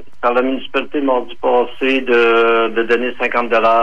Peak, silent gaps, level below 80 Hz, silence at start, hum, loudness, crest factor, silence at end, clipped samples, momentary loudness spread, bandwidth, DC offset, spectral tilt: -4 dBFS; none; -54 dBFS; 0.25 s; none; -15 LUFS; 12 dB; 0 s; under 0.1%; 6 LU; 7.4 kHz; 5%; -5 dB/octave